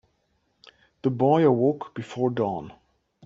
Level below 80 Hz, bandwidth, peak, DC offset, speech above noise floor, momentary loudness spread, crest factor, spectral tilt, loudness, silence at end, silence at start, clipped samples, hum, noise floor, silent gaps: -66 dBFS; 7.6 kHz; -8 dBFS; under 0.1%; 48 dB; 16 LU; 18 dB; -9 dB/octave; -24 LUFS; 0.55 s; 1.05 s; under 0.1%; none; -71 dBFS; none